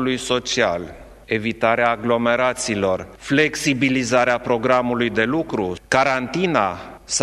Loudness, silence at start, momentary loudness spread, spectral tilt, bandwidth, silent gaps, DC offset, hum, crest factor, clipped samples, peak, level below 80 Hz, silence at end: -20 LUFS; 0 s; 7 LU; -4 dB/octave; 14.5 kHz; none; under 0.1%; none; 20 dB; under 0.1%; 0 dBFS; -48 dBFS; 0 s